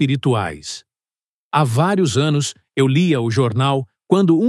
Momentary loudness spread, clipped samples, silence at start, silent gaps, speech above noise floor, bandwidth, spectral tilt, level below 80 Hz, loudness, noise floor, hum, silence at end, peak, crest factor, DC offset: 9 LU; under 0.1%; 0 s; 1.28-1.51 s; over 74 dB; 12.5 kHz; -6 dB/octave; -60 dBFS; -18 LUFS; under -90 dBFS; none; 0 s; 0 dBFS; 18 dB; under 0.1%